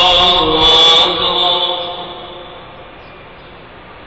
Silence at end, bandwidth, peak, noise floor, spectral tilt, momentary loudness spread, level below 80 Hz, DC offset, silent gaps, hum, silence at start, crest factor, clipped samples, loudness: 0 s; 8.2 kHz; 0 dBFS; -36 dBFS; -2.5 dB/octave; 23 LU; -36 dBFS; 0.3%; none; none; 0 s; 14 dB; under 0.1%; -9 LUFS